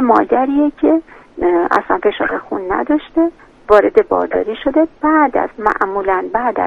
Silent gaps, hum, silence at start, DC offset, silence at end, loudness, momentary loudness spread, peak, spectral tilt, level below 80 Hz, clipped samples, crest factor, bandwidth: none; none; 0 s; under 0.1%; 0 s; -15 LUFS; 7 LU; 0 dBFS; -7 dB/octave; -44 dBFS; 0.1%; 14 dB; 6.8 kHz